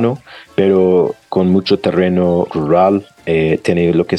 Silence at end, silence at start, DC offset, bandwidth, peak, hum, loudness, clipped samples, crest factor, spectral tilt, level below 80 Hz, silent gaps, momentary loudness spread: 0 s; 0 s; under 0.1%; 10 kHz; -2 dBFS; none; -14 LUFS; under 0.1%; 12 dB; -8 dB/octave; -46 dBFS; none; 7 LU